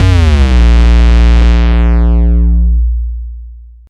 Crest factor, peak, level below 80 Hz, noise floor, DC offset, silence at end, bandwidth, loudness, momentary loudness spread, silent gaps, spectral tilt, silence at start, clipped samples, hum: 6 dB; 0 dBFS; -8 dBFS; -30 dBFS; under 0.1%; 0.25 s; 7.2 kHz; -10 LUFS; 10 LU; none; -7.5 dB/octave; 0 s; under 0.1%; none